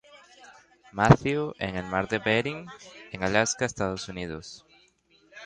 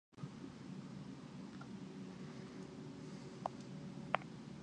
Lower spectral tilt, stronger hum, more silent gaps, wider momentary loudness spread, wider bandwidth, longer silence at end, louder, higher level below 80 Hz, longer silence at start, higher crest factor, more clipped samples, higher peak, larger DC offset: about the same, -5 dB/octave vs -6 dB/octave; neither; neither; first, 21 LU vs 9 LU; about the same, 10 kHz vs 10.5 kHz; about the same, 0 s vs 0 s; first, -26 LUFS vs -49 LUFS; first, -50 dBFS vs -74 dBFS; about the same, 0.15 s vs 0.1 s; second, 26 dB vs 36 dB; neither; first, -2 dBFS vs -12 dBFS; neither